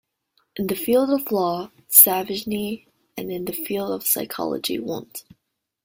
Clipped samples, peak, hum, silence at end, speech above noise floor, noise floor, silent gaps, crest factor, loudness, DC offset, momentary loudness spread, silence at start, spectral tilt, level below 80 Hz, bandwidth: under 0.1%; 0 dBFS; none; 0.65 s; 47 dB; -69 dBFS; none; 24 dB; -20 LUFS; under 0.1%; 21 LU; 0.55 s; -3 dB/octave; -62 dBFS; 16.5 kHz